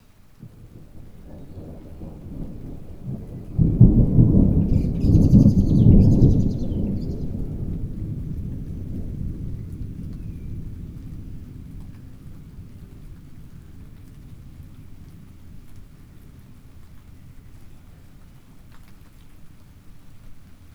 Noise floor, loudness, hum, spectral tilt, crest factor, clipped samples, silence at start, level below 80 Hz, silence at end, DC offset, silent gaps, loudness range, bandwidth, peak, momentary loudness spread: -45 dBFS; -20 LUFS; none; -11 dB/octave; 22 dB; under 0.1%; 0.4 s; -30 dBFS; 0.2 s; under 0.1%; none; 25 LU; 7 kHz; 0 dBFS; 28 LU